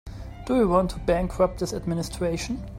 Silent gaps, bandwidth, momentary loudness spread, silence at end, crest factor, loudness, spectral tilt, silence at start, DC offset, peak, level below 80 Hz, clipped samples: none; 16 kHz; 9 LU; 0 s; 18 dB; -25 LUFS; -6 dB/octave; 0.05 s; under 0.1%; -8 dBFS; -38 dBFS; under 0.1%